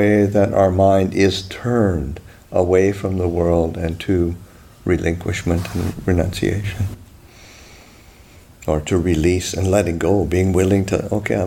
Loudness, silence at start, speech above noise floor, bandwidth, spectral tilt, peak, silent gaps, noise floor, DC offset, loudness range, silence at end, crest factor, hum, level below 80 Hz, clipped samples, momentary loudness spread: -18 LUFS; 0 s; 28 dB; 16.5 kHz; -6.5 dB/octave; -2 dBFS; none; -45 dBFS; under 0.1%; 6 LU; 0 s; 16 dB; none; -36 dBFS; under 0.1%; 9 LU